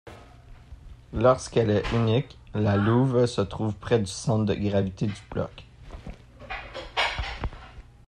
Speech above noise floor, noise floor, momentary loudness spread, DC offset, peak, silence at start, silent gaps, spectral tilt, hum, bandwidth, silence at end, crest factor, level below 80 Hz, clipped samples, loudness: 24 dB; -48 dBFS; 16 LU; under 0.1%; -8 dBFS; 0.05 s; none; -6.5 dB/octave; none; 10.5 kHz; 0.25 s; 18 dB; -44 dBFS; under 0.1%; -26 LUFS